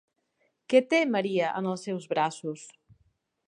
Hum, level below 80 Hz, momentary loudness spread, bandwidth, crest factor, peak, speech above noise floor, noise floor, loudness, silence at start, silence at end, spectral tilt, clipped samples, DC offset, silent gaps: none; -78 dBFS; 14 LU; 10.5 kHz; 22 dB; -8 dBFS; 47 dB; -74 dBFS; -27 LUFS; 0.7 s; 0.8 s; -5 dB/octave; under 0.1%; under 0.1%; none